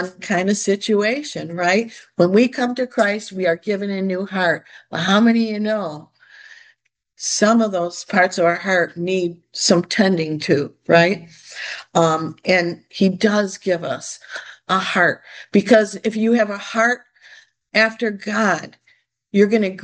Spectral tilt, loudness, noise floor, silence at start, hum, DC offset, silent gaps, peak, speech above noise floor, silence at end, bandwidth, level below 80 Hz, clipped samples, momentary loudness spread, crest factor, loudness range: -4.5 dB/octave; -18 LUFS; -61 dBFS; 0 s; none; under 0.1%; none; 0 dBFS; 43 dB; 0 s; 10 kHz; -66 dBFS; under 0.1%; 11 LU; 18 dB; 2 LU